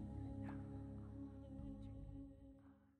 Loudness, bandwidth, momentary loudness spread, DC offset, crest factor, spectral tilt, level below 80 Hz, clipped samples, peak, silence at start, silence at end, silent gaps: -54 LUFS; 9.2 kHz; 11 LU; under 0.1%; 14 dB; -9.5 dB/octave; -60 dBFS; under 0.1%; -38 dBFS; 0 s; 0.05 s; none